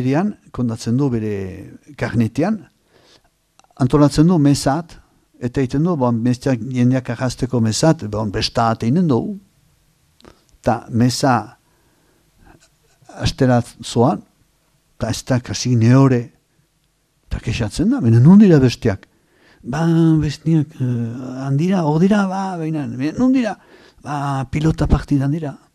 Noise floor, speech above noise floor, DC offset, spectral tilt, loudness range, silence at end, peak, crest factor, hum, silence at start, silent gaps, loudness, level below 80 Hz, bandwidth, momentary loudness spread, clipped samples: -63 dBFS; 47 dB; under 0.1%; -7 dB/octave; 7 LU; 0.2 s; 0 dBFS; 16 dB; none; 0 s; none; -17 LUFS; -38 dBFS; 13.5 kHz; 14 LU; under 0.1%